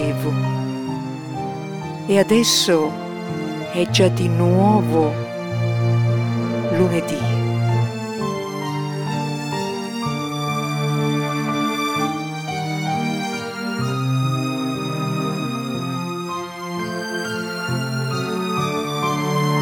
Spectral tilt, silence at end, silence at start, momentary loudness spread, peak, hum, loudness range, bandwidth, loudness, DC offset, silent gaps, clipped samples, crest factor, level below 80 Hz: -5.5 dB/octave; 0 s; 0 s; 10 LU; -2 dBFS; none; 6 LU; 19 kHz; -21 LUFS; under 0.1%; none; under 0.1%; 18 dB; -58 dBFS